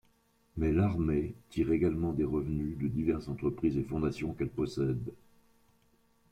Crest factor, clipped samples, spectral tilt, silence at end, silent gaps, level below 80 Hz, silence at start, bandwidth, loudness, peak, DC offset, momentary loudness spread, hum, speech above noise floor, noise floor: 16 dB; under 0.1%; -9 dB/octave; 1.15 s; none; -48 dBFS; 0.55 s; 11.5 kHz; -32 LUFS; -18 dBFS; under 0.1%; 7 LU; none; 38 dB; -69 dBFS